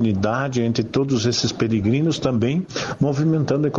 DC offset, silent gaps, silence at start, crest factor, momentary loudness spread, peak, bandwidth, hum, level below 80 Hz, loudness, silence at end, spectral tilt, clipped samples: under 0.1%; none; 0 s; 14 dB; 3 LU; -6 dBFS; 7.8 kHz; none; -50 dBFS; -21 LUFS; 0 s; -6 dB/octave; under 0.1%